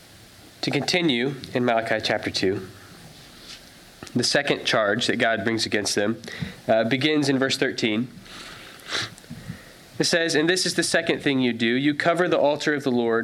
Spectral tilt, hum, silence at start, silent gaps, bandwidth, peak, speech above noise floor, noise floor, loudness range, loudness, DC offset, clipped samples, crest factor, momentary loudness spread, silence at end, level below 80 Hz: -4 dB/octave; none; 0.4 s; none; 16 kHz; -6 dBFS; 25 dB; -48 dBFS; 4 LU; -23 LUFS; under 0.1%; under 0.1%; 18 dB; 19 LU; 0 s; -60 dBFS